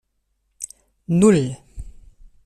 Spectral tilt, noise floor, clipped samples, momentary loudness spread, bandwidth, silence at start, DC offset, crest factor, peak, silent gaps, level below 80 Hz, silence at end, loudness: -6.5 dB/octave; -70 dBFS; under 0.1%; 22 LU; 13 kHz; 0.6 s; under 0.1%; 20 dB; -2 dBFS; none; -44 dBFS; 0.55 s; -18 LUFS